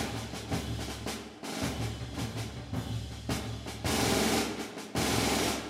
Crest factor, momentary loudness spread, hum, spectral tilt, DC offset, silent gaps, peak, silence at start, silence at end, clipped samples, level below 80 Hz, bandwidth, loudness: 20 dB; 11 LU; none; -4 dB/octave; under 0.1%; none; -14 dBFS; 0 s; 0 s; under 0.1%; -46 dBFS; 16 kHz; -33 LUFS